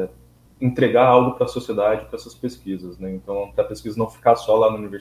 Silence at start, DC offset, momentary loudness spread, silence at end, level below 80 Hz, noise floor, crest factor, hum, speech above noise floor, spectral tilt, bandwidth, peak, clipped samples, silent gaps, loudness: 0 s; under 0.1%; 16 LU; 0 s; -50 dBFS; -50 dBFS; 20 dB; none; 30 dB; -7 dB/octave; 15 kHz; 0 dBFS; under 0.1%; none; -20 LUFS